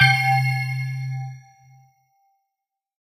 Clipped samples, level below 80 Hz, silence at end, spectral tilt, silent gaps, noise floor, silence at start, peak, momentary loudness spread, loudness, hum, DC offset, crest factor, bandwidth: under 0.1%; -66 dBFS; 1.7 s; -4 dB/octave; none; -84 dBFS; 0 s; -2 dBFS; 18 LU; -22 LUFS; none; under 0.1%; 22 dB; 16 kHz